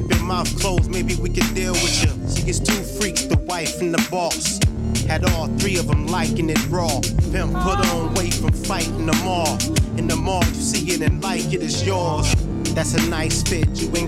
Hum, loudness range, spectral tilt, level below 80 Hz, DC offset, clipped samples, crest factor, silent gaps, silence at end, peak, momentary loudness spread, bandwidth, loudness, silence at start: none; 0 LU; -4.5 dB/octave; -28 dBFS; under 0.1%; under 0.1%; 14 dB; none; 0 s; -6 dBFS; 3 LU; 16.5 kHz; -20 LUFS; 0 s